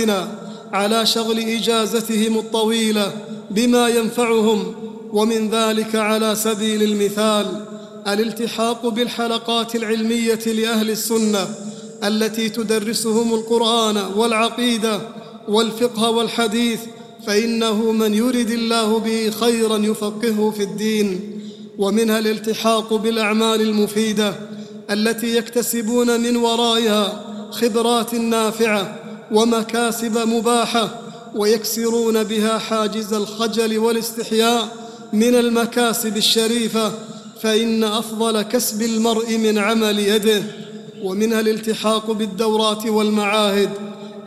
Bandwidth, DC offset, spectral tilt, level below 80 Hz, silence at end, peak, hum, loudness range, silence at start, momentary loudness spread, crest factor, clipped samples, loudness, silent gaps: 15 kHz; under 0.1%; -3.5 dB/octave; -62 dBFS; 0 s; -2 dBFS; none; 2 LU; 0 s; 8 LU; 18 dB; under 0.1%; -18 LUFS; none